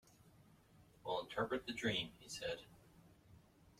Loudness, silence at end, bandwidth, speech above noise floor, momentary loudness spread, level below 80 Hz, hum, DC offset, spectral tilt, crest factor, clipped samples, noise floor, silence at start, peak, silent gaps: -43 LUFS; 0.1 s; 16 kHz; 24 dB; 11 LU; -72 dBFS; none; under 0.1%; -4 dB/octave; 20 dB; under 0.1%; -68 dBFS; 0.25 s; -26 dBFS; none